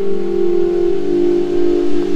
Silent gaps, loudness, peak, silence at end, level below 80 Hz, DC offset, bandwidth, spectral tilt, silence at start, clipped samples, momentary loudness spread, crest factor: none; -16 LUFS; -2 dBFS; 0 s; -38 dBFS; under 0.1%; 7.6 kHz; -7.5 dB/octave; 0 s; under 0.1%; 2 LU; 10 dB